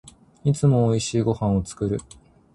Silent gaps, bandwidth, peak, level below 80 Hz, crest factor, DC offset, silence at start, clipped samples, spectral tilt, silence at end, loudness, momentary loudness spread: none; 11.5 kHz; -6 dBFS; -44 dBFS; 16 dB; under 0.1%; 0.45 s; under 0.1%; -7 dB/octave; 0.55 s; -23 LUFS; 8 LU